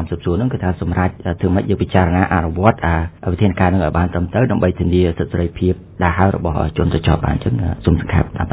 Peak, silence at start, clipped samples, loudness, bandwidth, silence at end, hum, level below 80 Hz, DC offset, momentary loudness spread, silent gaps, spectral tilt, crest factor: 0 dBFS; 0 s; under 0.1%; -17 LUFS; 4 kHz; 0 s; none; -26 dBFS; under 0.1%; 5 LU; none; -12 dB/octave; 16 dB